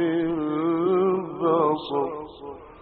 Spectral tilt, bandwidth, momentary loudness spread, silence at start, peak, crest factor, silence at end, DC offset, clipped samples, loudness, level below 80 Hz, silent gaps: -6 dB/octave; 4.5 kHz; 16 LU; 0 s; -8 dBFS; 16 dB; 0 s; under 0.1%; under 0.1%; -24 LUFS; -60 dBFS; none